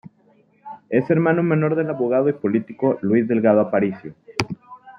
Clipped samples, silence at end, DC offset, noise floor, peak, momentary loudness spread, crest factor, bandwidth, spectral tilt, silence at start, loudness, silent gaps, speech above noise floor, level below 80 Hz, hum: under 0.1%; 0.1 s; under 0.1%; -57 dBFS; 0 dBFS; 13 LU; 20 dB; 10.5 kHz; -7.5 dB/octave; 0.65 s; -20 LUFS; none; 39 dB; -62 dBFS; none